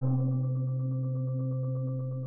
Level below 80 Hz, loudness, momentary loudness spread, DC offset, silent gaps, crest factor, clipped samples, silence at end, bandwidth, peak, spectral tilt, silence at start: -68 dBFS; -31 LUFS; 4 LU; under 0.1%; none; 10 dB; under 0.1%; 0 s; 1.4 kHz; -20 dBFS; -15.5 dB/octave; 0 s